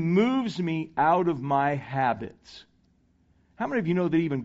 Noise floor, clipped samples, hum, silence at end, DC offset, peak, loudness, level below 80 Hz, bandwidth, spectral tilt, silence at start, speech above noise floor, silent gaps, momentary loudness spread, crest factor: -65 dBFS; under 0.1%; none; 0 s; under 0.1%; -10 dBFS; -26 LUFS; -62 dBFS; 7.8 kHz; -6 dB/octave; 0 s; 39 dB; none; 7 LU; 16 dB